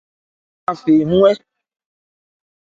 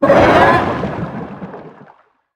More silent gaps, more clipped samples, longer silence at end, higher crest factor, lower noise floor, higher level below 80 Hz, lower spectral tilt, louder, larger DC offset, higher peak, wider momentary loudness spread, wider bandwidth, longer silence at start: neither; neither; first, 1.35 s vs 0.65 s; about the same, 18 dB vs 14 dB; first, under -90 dBFS vs -49 dBFS; second, -52 dBFS vs -38 dBFS; first, -8 dB/octave vs -6.5 dB/octave; second, -15 LUFS vs -12 LUFS; neither; about the same, 0 dBFS vs 0 dBFS; second, 13 LU vs 22 LU; second, 7.6 kHz vs 12 kHz; first, 0.7 s vs 0 s